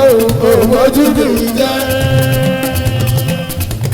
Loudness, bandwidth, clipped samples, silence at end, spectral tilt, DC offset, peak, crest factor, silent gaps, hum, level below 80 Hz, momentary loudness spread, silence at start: -12 LUFS; over 20 kHz; under 0.1%; 0 s; -5.5 dB/octave; under 0.1%; 0 dBFS; 12 dB; none; none; -30 dBFS; 7 LU; 0 s